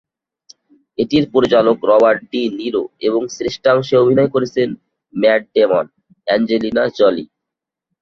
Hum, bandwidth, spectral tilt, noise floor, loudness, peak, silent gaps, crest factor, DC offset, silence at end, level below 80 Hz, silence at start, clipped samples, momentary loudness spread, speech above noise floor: none; 7.2 kHz; -6 dB/octave; -83 dBFS; -15 LUFS; -2 dBFS; none; 14 dB; under 0.1%; 0.75 s; -54 dBFS; 1 s; under 0.1%; 10 LU; 68 dB